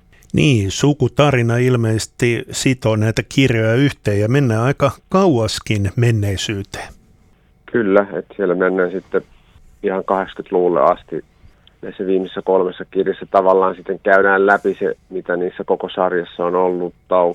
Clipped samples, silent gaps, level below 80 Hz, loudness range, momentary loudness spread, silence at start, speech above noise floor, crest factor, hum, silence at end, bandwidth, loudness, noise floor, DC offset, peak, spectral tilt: under 0.1%; none; -46 dBFS; 4 LU; 9 LU; 0.35 s; 36 dB; 16 dB; none; 0 s; 15 kHz; -17 LUFS; -52 dBFS; under 0.1%; 0 dBFS; -6 dB/octave